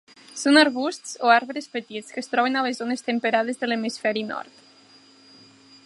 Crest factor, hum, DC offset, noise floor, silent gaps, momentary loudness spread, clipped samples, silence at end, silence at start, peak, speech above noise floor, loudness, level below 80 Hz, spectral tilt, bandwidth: 22 dB; none; under 0.1%; -53 dBFS; none; 15 LU; under 0.1%; 1.4 s; 0.35 s; -2 dBFS; 30 dB; -23 LUFS; -80 dBFS; -3 dB/octave; 11.5 kHz